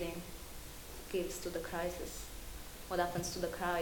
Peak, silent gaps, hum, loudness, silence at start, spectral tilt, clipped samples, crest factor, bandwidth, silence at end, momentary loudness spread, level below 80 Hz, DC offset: -20 dBFS; none; none; -41 LUFS; 0 s; -4 dB/octave; under 0.1%; 20 dB; 18 kHz; 0 s; 12 LU; -52 dBFS; under 0.1%